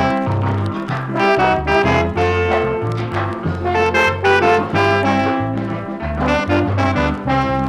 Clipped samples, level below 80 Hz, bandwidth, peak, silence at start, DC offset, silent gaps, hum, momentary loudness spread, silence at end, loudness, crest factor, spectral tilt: under 0.1%; -34 dBFS; 11.5 kHz; -2 dBFS; 0 s; under 0.1%; none; none; 7 LU; 0 s; -17 LUFS; 16 dB; -6.5 dB/octave